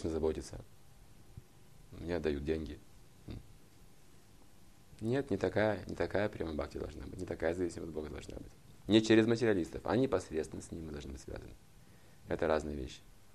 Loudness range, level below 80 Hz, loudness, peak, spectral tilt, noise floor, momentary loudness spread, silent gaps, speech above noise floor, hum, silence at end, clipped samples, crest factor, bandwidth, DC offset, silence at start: 10 LU; -54 dBFS; -35 LUFS; -14 dBFS; -6 dB/octave; -62 dBFS; 20 LU; none; 27 dB; none; 0.25 s; under 0.1%; 24 dB; 13.5 kHz; under 0.1%; 0 s